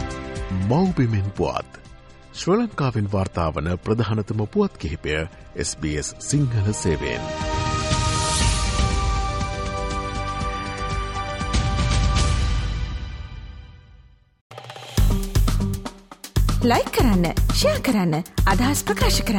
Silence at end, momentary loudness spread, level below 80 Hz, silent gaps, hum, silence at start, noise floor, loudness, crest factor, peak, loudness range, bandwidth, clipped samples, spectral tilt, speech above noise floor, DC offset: 0 s; 11 LU; -28 dBFS; 14.41-14.50 s; none; 0 s; -50 dBFS; -23 LUFS; 14 dB; -8 dBFS; 5 LU; 17 kHz; under 0.1%; -5 dB/octave; 29 dB; under 0.1%